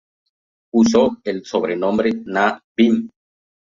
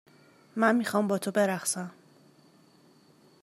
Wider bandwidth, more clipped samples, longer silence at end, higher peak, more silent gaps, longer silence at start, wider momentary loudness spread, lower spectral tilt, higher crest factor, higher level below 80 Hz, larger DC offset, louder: second, 7.4 kHz vs 16 kHz; neither; second, 0.65 s vs 1.5 s; first, -2 dBFS vs -10 dBFS; first, 2.64-2.75 s vs none; first, 0.75 s vs 0.55 s; second, 8 LU vs 12 LU; about the same, -5.5 dB/octave vs -4.5 dB/octave; second, 16 dB vs 22 dB; first, -56 dBFS vs -84 dBFS; neither; first, -18 LUFS vs -27 LUFS